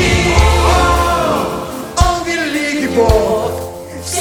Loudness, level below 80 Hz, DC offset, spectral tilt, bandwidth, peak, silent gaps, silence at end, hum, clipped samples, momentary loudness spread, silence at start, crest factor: -14 LUFS; -20 dBFS; under 0.1%; -4.5 dB/octave; 18.5 kHz; 0 dBFS; none; 0 s; none; under 0.1%; 10 LU; 0 s; 14 dB